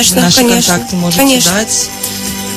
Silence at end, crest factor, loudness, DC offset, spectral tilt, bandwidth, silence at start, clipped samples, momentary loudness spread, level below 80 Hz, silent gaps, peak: 0 s; 10 dB; -9 LUFS; under 0.1%; -3 dB/octave; over 20 kHz; 0 s; 0.2%; 9 LU; -38 dBFS; none; 0 dBFS